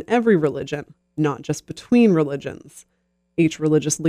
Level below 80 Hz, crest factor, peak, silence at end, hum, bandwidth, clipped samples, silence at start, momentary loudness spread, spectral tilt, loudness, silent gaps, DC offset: -58 dBFS; 16 dB; -4 dBFS; 0 s; none; 14.5 kHz; under 0.1%; 0 s; 15 LU; -6 dB/octave; -20 LUFS; none; under 0.1%